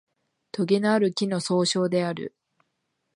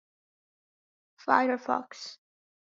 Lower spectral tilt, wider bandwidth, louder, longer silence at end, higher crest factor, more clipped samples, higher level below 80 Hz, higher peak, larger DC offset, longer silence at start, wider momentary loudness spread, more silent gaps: first, -5 dB/octave vs -1 dB/octave; first, 11 kHz vs 7.6 kHz; first, -24 LUFS vs -28 LUFS; first, 0.9 s vs 0.6 s; second, 16 dB vs 26 dB; neither; first, -74 dBFS vs -80 dBFS; about the same, -10 dBFS vs -8 dBFS; neither; second, 0.55 s vs 1.25 s; second, 14 LU vs 17 LU; neither